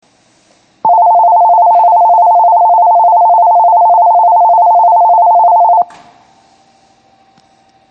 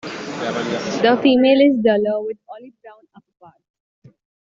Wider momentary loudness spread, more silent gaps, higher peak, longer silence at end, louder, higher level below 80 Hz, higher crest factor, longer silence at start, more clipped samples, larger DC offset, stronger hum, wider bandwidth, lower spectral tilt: second, 2 LU vs 19 LU; neither; about the same, -2 dBFS vs -4 dBFS; first, 2.05 s vs 1.6 s; first, -7 LUFS vs -17 LUFS; second, -70 dBFS vs -62 dBFS; second, 6 dB vs 16 dB; first, 0.85 s vs 0.05 s; neither; neither; neither; second, 2.8 kHz vs 7.6 kHz; about the same, -5.5 dB/octave vs -5.5 dB/octave